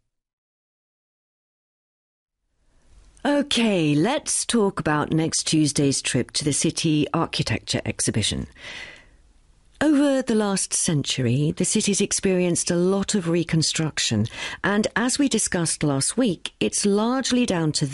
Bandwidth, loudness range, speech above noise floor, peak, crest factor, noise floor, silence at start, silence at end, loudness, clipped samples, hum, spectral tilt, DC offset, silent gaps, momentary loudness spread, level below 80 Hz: 11.5 kHz; 4 LU; 41 dB; -8 dBFS; 14 dB; -63 dBFS; 3.25 s; 0 s; -22 LUFS; under 0.1%; none; -4 dB/octave; under 0.1%; none; 5 LU; -50 dBFS